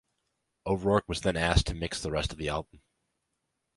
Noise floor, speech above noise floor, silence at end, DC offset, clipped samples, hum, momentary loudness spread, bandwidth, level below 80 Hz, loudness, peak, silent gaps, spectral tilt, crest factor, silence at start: -81 dBFS; 52 dB; 1.15 s; under 0.1%; under 0.1%; none; 8 LU; 11.5 kHz; -40 dBFS; -30 LUFS; -8 dBFS; none; -5 dB/octave; 24 dB; 0.65 s